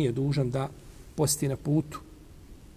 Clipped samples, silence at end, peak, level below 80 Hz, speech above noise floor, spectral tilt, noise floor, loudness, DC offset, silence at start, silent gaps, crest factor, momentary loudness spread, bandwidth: under 0.1%; 0.1 s; -14 dBFS; -50 dBFS; 21 dB; -5.5 dB/octave; -49 dBFS; -29 LUFS; under 0.1%; 0 s; none; 16 dB; 16 LU; 16 kHz